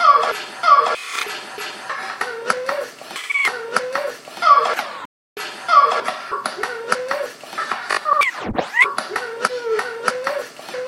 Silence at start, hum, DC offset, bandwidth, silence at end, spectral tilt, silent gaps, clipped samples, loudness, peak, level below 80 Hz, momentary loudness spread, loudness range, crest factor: 0 s; none; under 0.1%; 16.5 kHz; 0 s; -1.5 dB/octave; 5.05-5.36 s; under 0.1%; -19 LUFS; 0 dBFS; -54 dBFS; 15 LU; 3 LU; 20 dB